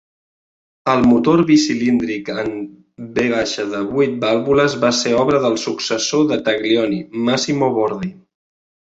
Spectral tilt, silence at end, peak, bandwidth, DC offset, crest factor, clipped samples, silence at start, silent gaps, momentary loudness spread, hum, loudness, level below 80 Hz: -4.5 dB/octave; 0.85 s; -2 dBFS; 8 kHz; under 0.1%; 16 dB; under 0.1%; 0.85 s; none; 11 LU; none; -17 LUFS; -52 dBFS